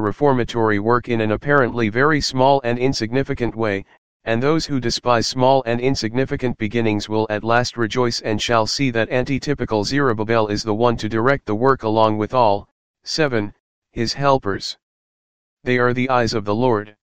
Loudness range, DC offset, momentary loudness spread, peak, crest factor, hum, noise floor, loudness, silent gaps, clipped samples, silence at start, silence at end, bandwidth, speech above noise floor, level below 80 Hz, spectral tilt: 3 LU; 2%; 7 LU; 0 dBFS; 18 dB; none; under -90 dBFS; -19 LUFS; 3.98-4.20 s, 12.72-12.94 s, 13.60-13.82 s, 14.83-15.57 s; under 0.1%; 0 s; 0.1 s; 15.5 kHz; over 71 dB; -44 dBFS; -5.5 dB/octave